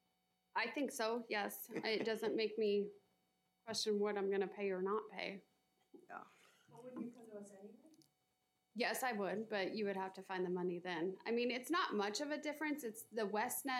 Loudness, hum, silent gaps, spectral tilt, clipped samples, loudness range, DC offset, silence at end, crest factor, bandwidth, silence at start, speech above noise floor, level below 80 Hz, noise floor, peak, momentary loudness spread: -41 LUFS; none; none; -4 dB/octave; under 0.1%; 8 LU; under 0.1%; 0 s; 18 dB; 16 kHz; 0.55 s; 43 dB; under -90 dBFS; -84 dBFS; -24 dBFS; 16 LU